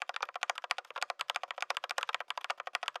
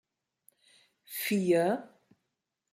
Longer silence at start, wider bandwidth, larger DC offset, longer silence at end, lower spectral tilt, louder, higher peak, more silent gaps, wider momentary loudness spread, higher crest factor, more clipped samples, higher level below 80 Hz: second, 0 s vs 1.1 s; about the same, 15.5 kHz vs 16 kHz; neither; second, 0 s vs 0.85 s; second, 3.5 dB/octave vs -5.5 dB/octave; second, -37 LUFS vs -30 LUFS; first, -12 dBFS vs -16 dBFS; neither; second, 3 LU vs 11 LU; first, 26 dB vs 18 dB; neither; second, under -90 dBFS vs -80 dBFS